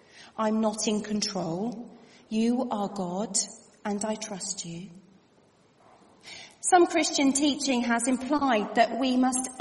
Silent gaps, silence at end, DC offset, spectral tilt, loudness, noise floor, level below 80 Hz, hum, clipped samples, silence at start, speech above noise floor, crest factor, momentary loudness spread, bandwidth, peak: none; 0 s; under 0.1%; -3.5 dB/octave; -27 LUFS; -61 dBFS; -66 dBFS; none; under 0.1%; 0.15 s; 35 dB; 20 dB; 16 LU; 11.5 kHz; -8 dBFS